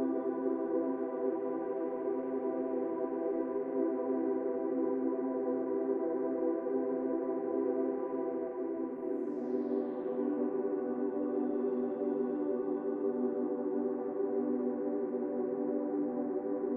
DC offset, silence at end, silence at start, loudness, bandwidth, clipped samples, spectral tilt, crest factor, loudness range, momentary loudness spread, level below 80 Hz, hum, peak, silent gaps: under 0.1%; 0 s; 0 s; -35 LUFS; 2.9 kHz; under 0.1%; -8.5 dB/octave; 14 dB; 1 LU; 3 LU; -84 dBFS; none; -20 dBFS; none